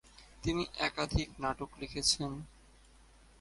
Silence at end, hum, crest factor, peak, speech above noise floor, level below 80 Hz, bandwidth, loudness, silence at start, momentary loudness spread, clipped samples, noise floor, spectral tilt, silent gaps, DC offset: 0.9 s; none; 20 dB; -16 dBFS; 25 dB; -48 dBFS; 11.5 kHz; -35 LUFS; 0.05 s; 11 LU; under 0.1%; -61 dBFS; -3.5 dB/octave; none; under 0.1%